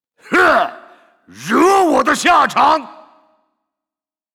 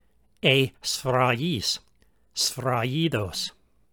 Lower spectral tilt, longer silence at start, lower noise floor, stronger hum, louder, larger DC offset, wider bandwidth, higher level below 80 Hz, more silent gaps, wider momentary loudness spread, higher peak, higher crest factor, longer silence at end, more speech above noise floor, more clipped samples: about the same, -3 dB/octave vs -4 dB/octave; second, 0.3 s vs 0.45 s; first, -89 dBFS vs -64 dBFS; neither; first, -13 LUFS vs -25 LUFS; neither; about the same, 18.5 kHz vs over 20 kHz; first, -52 dBFS vs -58 dBFS; neither; about the same, 8 LU vs 10 LU; about the same, -4 dBFS vs -4 dBFS; second, 12 dB vs 22 dB; first, 1.45 s vs 0.4 s; first, 75 dB vs 39 dB; neither